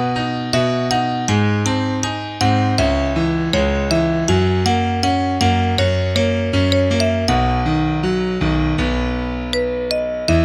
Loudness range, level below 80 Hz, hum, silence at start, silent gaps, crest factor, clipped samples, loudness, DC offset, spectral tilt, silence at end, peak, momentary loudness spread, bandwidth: 1 LU; -30 dBFS; none; 0 s; none; 16 dB; under 0.1%; -18 LUFS; under 0.1%; -5.5 dB/octave; 0 s; -2 dBFS; 5 LU; 13.5 kHz